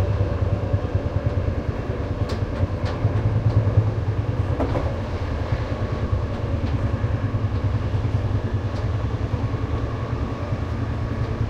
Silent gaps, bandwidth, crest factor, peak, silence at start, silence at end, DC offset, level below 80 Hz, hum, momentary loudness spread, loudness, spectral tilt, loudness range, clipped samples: none; 7.2 kHz; 18 dB; -6 dBFS; 0 s; 0 s; under 0.1%; -32 dBFS; none; 5 LU; -24 LUFS; -8.5 dB/octave; 2 LU; under 0.1%